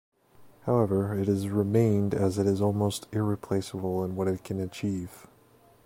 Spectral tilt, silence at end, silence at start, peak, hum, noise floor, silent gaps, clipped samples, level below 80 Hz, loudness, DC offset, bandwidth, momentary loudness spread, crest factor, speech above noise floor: -7.5 dB/octave; 0.65 s; 0.4 s; -12 dBFS; none; -59 dBFS; none; under 0.1%; -60 dBFS; -28 LUFS; under 0.1%; 16.5 kHz; 8 LU; 16 dB; 32 dB